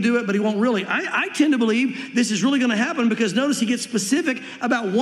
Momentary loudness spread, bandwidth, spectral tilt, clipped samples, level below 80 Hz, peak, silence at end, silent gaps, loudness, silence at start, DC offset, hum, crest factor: 4 LU; 13 kHz; -4 dB/octave; under 0.1%; -80 dBFS; -6 dBFS; 0 s; none; -21 LUFS; 0 s; under 0.1%; none; 14 dB